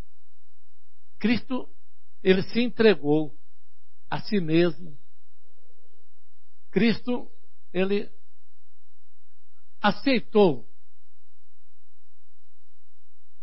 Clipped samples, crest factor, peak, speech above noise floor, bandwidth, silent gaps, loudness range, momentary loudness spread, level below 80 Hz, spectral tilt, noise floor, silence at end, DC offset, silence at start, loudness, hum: under 0.1%; 24 dB; -4 dBFS; 53 dB; 5.8 kHz; none; 6 LU; 14 LU; -62 dBFS; -10 dB/octave; -77 dBFS; 2.85 s; 5%; 1.2 s; -25 LUFS; none